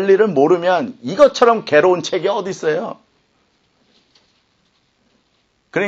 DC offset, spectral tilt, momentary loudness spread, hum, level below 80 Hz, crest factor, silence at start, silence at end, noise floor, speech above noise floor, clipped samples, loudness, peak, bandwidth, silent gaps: under 0.1%; -5 dB/octave; 11 LU; none; -62 dBFS; 16 dB; 0 s; 0 s; -63 dBFS; 48 dB; under 0.1%; -15 LUFS; 0 dBFS; 8 kHz; none